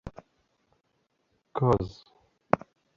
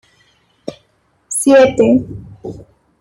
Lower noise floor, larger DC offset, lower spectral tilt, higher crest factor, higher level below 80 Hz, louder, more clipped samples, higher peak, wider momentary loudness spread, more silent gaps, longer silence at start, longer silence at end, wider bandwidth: first, -75 dBFS vs -59 dBFS; neither; first, -8.5 dB/octave vs -4.5 dB/octave; first, 30 dB vs 14 dB; second, -52 dBFS vs -46 dBFS; second, -29 LUFS vs -12 LUFS; neither; about the same, -2 dBFS vs -2 dBFS; second, 13 LU vs 23 LU; neither; second, 0.05 s vs 0.7 s; about the same, 0.4 s vs 0.4 s; second, 7.4 kHz vs 16 kHz